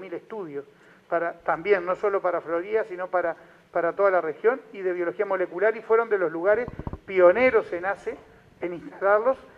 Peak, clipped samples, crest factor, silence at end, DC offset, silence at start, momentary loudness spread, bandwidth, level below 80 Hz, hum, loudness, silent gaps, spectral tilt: -4 dBFS; under 0.1%; 20 dB; 0.1 s; under 0.1%; 0 s; 14 LU; 7 kHz; -56 dBFS; none; -24 LUFS; none; -7.5 dB/octave